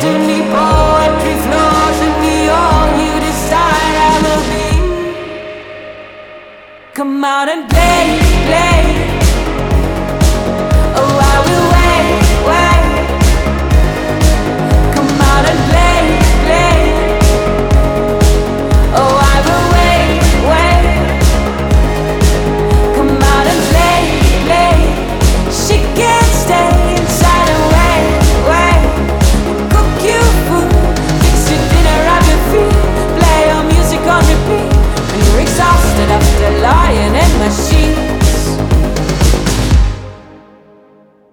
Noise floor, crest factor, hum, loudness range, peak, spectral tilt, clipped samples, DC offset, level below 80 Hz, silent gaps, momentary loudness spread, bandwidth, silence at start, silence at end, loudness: -44 dBFS; 10 dB; none; 3 LU; 0 dBFS; -5 dB/octave; under 0.1%; under 0.1%; -14 dBFS; none; 5 LU; 18.5 kHz; 0 s; 0.95 s; -11 LUFS